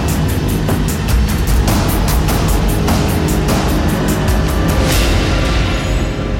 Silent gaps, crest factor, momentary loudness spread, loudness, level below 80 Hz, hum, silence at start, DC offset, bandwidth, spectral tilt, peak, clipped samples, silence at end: none; 10 dB; 3 LU; -15 LUFS; -18 dBFS; none; 0 s; under 0.1%; 17 kHz; -5.5 dB/octave; -2 dBFS; under 0.1%; 0 s